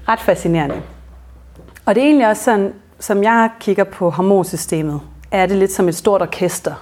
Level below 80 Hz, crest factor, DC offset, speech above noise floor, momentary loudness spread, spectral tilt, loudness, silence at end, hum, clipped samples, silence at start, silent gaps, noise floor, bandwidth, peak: -42 dBFS; 14 dB; under 0.1%; 25 dB; 11 LU; -5.5 dB/octave; -16 LUFS; 0 s; none; under 0.1%; 0 s; none; -40 dBFS; 17 kHz; -2 dBFS